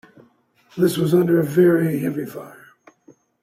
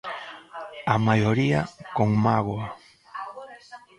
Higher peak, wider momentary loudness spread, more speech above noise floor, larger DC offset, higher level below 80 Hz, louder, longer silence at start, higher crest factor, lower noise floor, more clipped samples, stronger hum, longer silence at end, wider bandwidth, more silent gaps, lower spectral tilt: about the same, -4 dBFS vs -4 dBFS; second, 17 LU vs 20 LU; first, 39 dB vs 24 dB; neither; second, -62 dBFS vs -54 dBFS; first, -19 LUFS vs -24 LUFS; first, 0.75 s vs 0.05 s; second, 16 dB vs 22 dB; first, -57 dBFS vs -46 dBFS; neither; neither; first, 0.9 s vs 0.2 s; first, 16 kHz vs 10.5 kHz; neither; about the same, -7 dB/octave vs -7.5 dB/octave